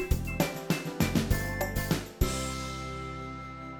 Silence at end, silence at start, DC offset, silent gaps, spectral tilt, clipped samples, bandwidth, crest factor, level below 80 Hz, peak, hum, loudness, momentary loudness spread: 0 s; 0 s; under 0.1%; none; -5 dB/octave; under 0.1%; 19.5 kHz; 20 dB; -38 dBFS; -10 dBFS; none; -32 LUFS; 9 LU